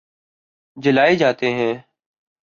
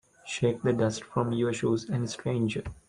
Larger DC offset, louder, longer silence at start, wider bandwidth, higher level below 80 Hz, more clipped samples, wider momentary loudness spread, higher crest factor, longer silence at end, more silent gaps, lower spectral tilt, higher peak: neither; first, -18 LUFS vs -29 LUFS; first, 0.75 s vs 0.25 s; second, 7.2 kHz vs 10.5 kHz; second, -62 dBFS vs -56 dBFS; neither; first, 9 LU vs 4 LU; about the same, 16 dB vs 18 dB; first, 0.65 s vs 0.15 s; neither; about the same, -6 dB/octave vs -6 dB/octave; first, -4 dBFS vs -12 dBFS